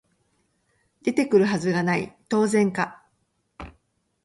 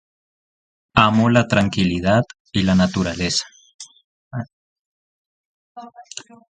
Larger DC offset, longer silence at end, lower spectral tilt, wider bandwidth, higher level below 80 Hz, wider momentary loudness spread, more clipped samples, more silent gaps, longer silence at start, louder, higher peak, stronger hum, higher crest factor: neither; first, 0.55 s vs 0.35 s; about the same, -6 dB/octave vs -5.5 dB/octave; first, 11.5 kHz vs 9.4 kHz; second, -58 dBFS vs -44 dBFS; about the same, 23 LU vs 24 LU; neither; second, none vs 2.40-2.45 s, 3.74-3.79 s, 4.04-4.31 s, 4.53-5.75 s; about the same, 1.05 s vs 0.95 s; second, -23 LUFS vs -18 LUFS; second, -6 dBFS vs 0 dBFS; neither; about the same, 20 dB vs 22 dB